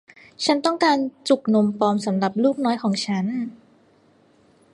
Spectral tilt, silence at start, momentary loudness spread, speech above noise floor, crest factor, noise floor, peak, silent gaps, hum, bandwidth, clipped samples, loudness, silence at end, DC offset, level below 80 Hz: -5.5 dB/octave; 0.4 s; 6 LU; 36 dB; 18 dB; -57 dBFS; -4 dBFS; none; none; 11.5 kHz; under 0.1%; -21 LUFS; 1.2 s; under 0.1%; -70 dBFS